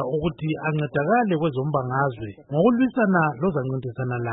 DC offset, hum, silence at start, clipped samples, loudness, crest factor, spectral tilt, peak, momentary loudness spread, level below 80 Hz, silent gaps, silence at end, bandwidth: under 0.1%; none; 0 s; under 0.1%; -23 LUFS; 16 dB; -12.5 dB/octave; -6 dBFS; 8 LU; -52 dBFS; none; 0 s; 4 kHz